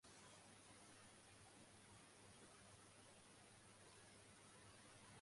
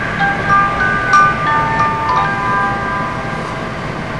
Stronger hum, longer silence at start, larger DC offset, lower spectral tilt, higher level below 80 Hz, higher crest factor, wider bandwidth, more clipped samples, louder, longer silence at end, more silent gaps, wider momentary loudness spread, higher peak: neither; about the same, 0 s vs 0 s; second, under 0.1% vs 0.8%; second, -3 dB/octave vs -5 dB/octave; second, -84 dBFS vs -34 dBFS; about the same, 16 dB vs 14 dB; about the same, 11.5 kHz vs 11 kHz; neither; second, -65 LUFS vs -14 LUFS; about the same, 0 s vs 0 s; neither; second, 2 LU vs 11 LU; second, -52 dBFS vs -2 dBFS